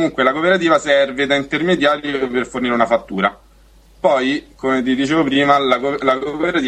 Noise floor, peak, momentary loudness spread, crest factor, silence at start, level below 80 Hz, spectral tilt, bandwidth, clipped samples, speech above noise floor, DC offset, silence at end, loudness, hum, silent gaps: -48 dBFS; 0 dBFS; 6 LU; 16 dB; 0 s; -48 dBFS; -5 dB/octave; 10 kHz; under 0.1%; 31 dB; under 0.1%; 0 s; -16 LUFS; none; none